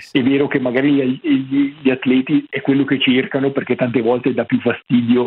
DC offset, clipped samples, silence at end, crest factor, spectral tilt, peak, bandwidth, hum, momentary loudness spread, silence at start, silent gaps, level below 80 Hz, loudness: under 0.1%; under 0.1%; 0 s; 14 dB; -8 dB/octave; -2 dBFS; 5.4 kHz; none; 4 LU; 0 s; none; -60 dBFS; -17 LUFS